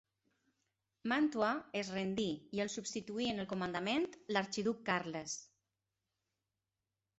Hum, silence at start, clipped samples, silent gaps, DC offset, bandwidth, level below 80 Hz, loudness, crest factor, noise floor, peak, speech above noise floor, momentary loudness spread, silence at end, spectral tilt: none; 1.05 s; under 0.1%; none; under 0.1%; 8.2 kHz; -74 dBFS; -38 LUFS; 20 dB; under -90 dBFS; -20 dBFS; over 52 dB; 8 LU; 1.75 s; -4 dB/octave